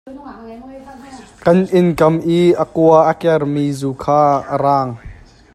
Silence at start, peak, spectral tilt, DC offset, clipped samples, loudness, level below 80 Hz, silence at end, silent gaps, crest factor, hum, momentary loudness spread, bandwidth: 0.05 s; 0 dBFS; -7.5 dB/octave; under 0.1%; under 0.1%; -14 LUFS; -46 dBFS; 0.4 s; none; 14 dB; none; 22 LU; 13.5 kHz